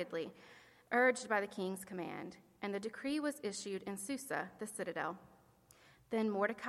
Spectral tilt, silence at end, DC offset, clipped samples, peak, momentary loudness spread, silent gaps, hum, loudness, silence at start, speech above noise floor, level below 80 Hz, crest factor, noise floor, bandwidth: -4 dB/octave; 0 s; under 0.1%; under 0.1%; -20 dBFS; 15 LU; none; none; -39 LUFS; 0 s; 27 dB; -80 dBFS; 20 dB; -66 dBFS; 16 kHz